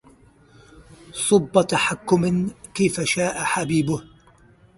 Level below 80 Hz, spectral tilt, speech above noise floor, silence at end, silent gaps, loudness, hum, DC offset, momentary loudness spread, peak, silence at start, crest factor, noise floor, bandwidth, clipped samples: -54 dBFS; -4.5 dB/octave; 32 dB; 0.7 s; none; -21 LUFS; none; under 0.1%; 8 LU; -2 dBFS; 0.75 s; 20 dB; -53 dBFS; 11.5 kHz; under 0.1%